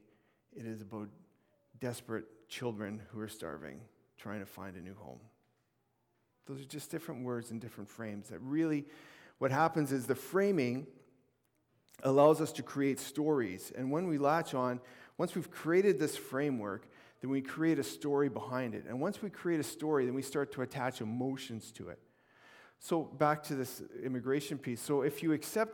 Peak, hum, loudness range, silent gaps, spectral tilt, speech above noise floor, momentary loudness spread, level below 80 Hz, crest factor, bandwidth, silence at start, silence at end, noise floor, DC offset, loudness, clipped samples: -14 dBFS; none; 13 LU; none; -6 dB/octave; 43 dB; 16 LU; -78 dBFS; 22 dB; 19 kHz; 0.55 s; 0 s; -79 dBFS; under 0.1%; -35 LUFS; under 0.1%